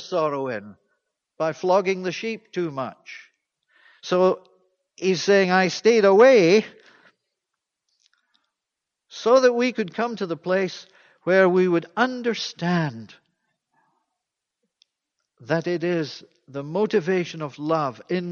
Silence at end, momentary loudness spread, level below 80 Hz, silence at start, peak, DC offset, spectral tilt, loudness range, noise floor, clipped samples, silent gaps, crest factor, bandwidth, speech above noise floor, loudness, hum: 0 s; 16 LU; -72 dBFS; 0 s; -4 dBFS; under 0.1%; -5.5 dB/octave; 11 LU; -85 dBFS; under 0.1%; none; 20 dB; 7.2 kHz; 64 dB; -21 LUFS; none